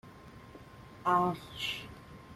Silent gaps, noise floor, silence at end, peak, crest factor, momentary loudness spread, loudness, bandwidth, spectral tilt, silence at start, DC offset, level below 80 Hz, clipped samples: none; -52 dBFS; 0 s; -14 dBFS; 22 dB; 23 LU; -33 LUFS; 15.5 kHz; -5 dB/octave; 0.05 s; under 0.1%; -62 dBFS; under 0.1%